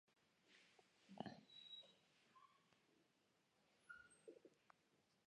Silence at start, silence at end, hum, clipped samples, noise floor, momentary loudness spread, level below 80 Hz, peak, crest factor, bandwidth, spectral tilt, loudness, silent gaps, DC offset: 0.05 s; 0.05 s; none; under 0.1%; -83 dBFS; 10 LU; under -90 dBFS; -34 dBFS; 32 dB; 9.6 kHz; -4.5 dB/octave; -61 LUFS; none; under 0.1%